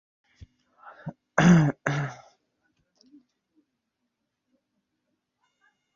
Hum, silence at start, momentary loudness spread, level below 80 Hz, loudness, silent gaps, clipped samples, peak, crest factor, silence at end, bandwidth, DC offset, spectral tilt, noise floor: none; 1.05 s; 24 LU; -58 dBFS; -23 LUFS; none; under 0.1%; -6 dBFS; 24 dB; 3.8 s; 7.4 kHz; under 0.1%; -6.5 dB/octave; -81 dBFS